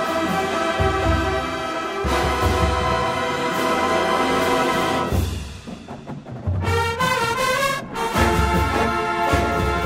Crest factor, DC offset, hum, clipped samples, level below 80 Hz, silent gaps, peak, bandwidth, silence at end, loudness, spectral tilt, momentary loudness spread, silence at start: 16 dB; under 0.1%; none; under 0.1%; -32 dBFS; none; -4 dBFS; 16 kHz; 0 s; -21 LUFS; -5 dB/octave; 8 LU; 0 s